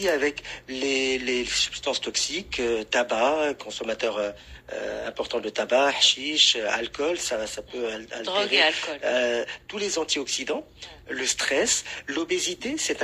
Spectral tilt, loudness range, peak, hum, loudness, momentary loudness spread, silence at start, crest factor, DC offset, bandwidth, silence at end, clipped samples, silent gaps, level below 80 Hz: -1 dB/octave; 4 LU; -6 dBFS; none; -25 LUFS; 13 LU; 0 s; 20 dB; under 0.1%; 15.5 kHz; 0 s; under 0.1%; none; -56 dBFS